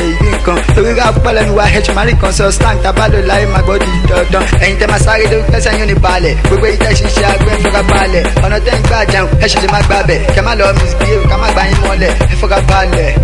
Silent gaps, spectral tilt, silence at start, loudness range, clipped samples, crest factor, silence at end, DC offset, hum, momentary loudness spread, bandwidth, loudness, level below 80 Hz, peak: none; -5 dB/octave; 0 s; 0 LU; 0.1%; 8 dB; 0 s; under 0.1%; none; 2 LU; 11.5 kHz; -10 LUFS; -12 dBFS; 0 dBFS